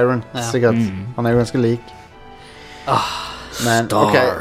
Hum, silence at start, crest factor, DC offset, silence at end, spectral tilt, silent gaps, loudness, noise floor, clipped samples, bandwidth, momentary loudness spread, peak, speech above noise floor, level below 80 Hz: none; 0 s; 18 dB; under 0.1%; 0 s; -5.5 dB/octave; none; -18 LUFS; -40 dBFS; under 0.1%; 16 kHz; 13 LU; 0 dBFS; 23 dB; -46 dBFS